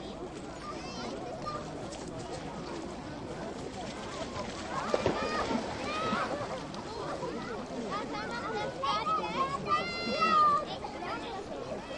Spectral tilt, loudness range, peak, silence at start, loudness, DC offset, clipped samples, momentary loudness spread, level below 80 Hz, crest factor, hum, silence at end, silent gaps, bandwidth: -4.5 dB/octave; 9 LU; -12 dBFS; 0 s; -34 LUFS; under 0.1%; under 0.1%; 11 LU; -56 dBFS; 22 dB; none; 0 s; none; 11.5 kHz